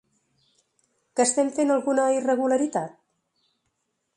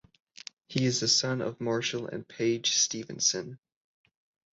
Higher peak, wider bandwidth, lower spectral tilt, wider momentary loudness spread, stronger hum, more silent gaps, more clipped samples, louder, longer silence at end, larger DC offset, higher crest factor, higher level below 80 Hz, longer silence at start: about the same, -10 dBFS vs -12 dBFS; first, 11.5 kHz vs 8 kHz; about the same, -3.5 dB/octave vs -2.5 dB/octave; second, 9 LU vs 19 LU; neither; neither; neither; first, -23 LUFS vs -28 LUFS; first, 1.3 s vs 0.95 s; neither; about the same, 16 dB vs 20 dB; second, -76 dBFS vs -70 dBFS; first, 1.15 s vs 0.7 s